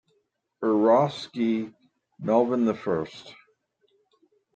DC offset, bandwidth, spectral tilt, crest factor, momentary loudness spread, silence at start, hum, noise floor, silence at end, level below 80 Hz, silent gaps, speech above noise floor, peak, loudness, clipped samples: under 0.1%; 8.2 kHz; -7.5 dB/octave; 18 dB; 16 LU; 0.6 s; none; -73 dBFS; 1.25 s; -70 dBFS; none; 49 dB; -8 dBFS; -25 LUFS; under 0.1%